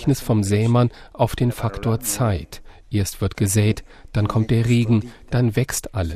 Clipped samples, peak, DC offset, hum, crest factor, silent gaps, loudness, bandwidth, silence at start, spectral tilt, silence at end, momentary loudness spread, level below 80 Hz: under 0.1%; -6 dBFS; under 0.1%; none; 16 dB; none; -21 LUFS; 15.5 kHz; 0 s; -6 dB/octave; 0 s; 7 LU; -38 dBFS